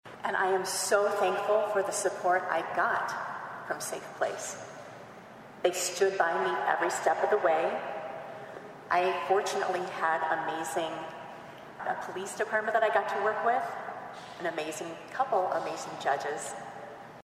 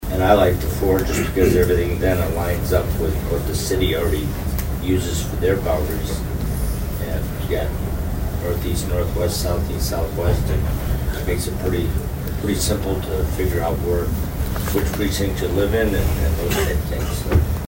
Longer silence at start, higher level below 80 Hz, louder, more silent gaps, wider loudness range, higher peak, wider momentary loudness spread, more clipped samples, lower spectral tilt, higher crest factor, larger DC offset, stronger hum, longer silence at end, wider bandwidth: about the same, 0.05 s vs 0 s; second, -76 dBFS vs -24 dBFS; second, -30 LUFS vs -21 LUFS; neither; about the same, 4 LU vs 4 LU; second, -10 dBFS vs 0 dBFS; first, 16 LU vs 6 LU; neither; second, -2.5 dB/octave vs -6 dB/octave; about the same, 20 dB vs 20 dB; neither; neither; about the same, 0.05 s vs 0 s; about the same, 15.5 kHz vs 16.5 kHz